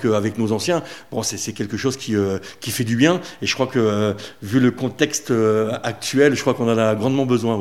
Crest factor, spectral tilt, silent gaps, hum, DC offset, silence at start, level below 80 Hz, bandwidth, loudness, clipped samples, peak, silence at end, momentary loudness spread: 18 dB; -5 dB/octave; none; none; 0.4%; 0 s; -60 dBFS; 16 kHz; -20 LUFS; under 0.1%; 0 dBFS; 0 s; 7 LU